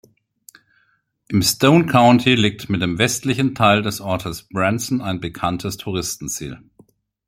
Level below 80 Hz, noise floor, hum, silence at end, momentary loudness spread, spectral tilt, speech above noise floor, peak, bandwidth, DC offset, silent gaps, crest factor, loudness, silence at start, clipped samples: -50 dBFS; -64 dBFS; none; 0.7 s; 13 LU; -4.5 dB/octave; 46 dB; 0 dBFS; 16.5 kHz; under 0.1%; none; 20 dB; -18 LUFS; 1.3 s; under 0.1%